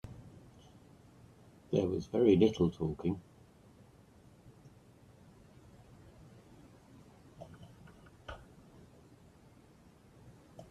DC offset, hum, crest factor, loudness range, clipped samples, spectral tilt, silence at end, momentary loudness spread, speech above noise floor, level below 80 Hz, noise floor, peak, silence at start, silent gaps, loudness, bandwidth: under 0.1%; none; 24 dB; 24 LU; under 0.1%; -8 dB/octave; 0.1 s; 31 LU; 31 dB; -64 dBFS; -61 dBFS; -14 dBFS; 0.05 s; none; -32 LUFS; 12.5 kHz